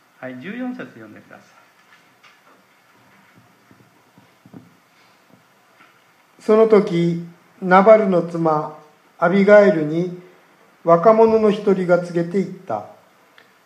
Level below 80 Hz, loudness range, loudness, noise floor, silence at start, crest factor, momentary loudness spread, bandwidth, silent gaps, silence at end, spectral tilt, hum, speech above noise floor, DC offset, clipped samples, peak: -68 dBFS; 13 LU; -16 LUFS; -55 dBFS; 0.2 s; 20 dB; 20 LU; 9.8 kHz; none; 0.8 s; -8 dB/octave; none; 39 dB; under 0.1%; under 0.1%; 0 dBFS